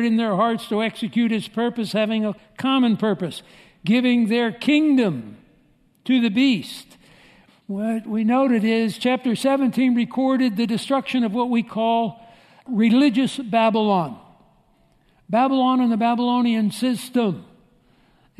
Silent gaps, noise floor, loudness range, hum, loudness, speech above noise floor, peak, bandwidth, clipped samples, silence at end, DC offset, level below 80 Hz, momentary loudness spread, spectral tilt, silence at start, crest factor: none; -59 dBFS; 2 LU; none; -21 LUFS; 39 dB; -6 dBFS; 13.5 kHz; under 0.1%; 0.95 s; under 0.1%; -66 dBFS; 9 LU; -6 dB/octave; 0 s; 16 dB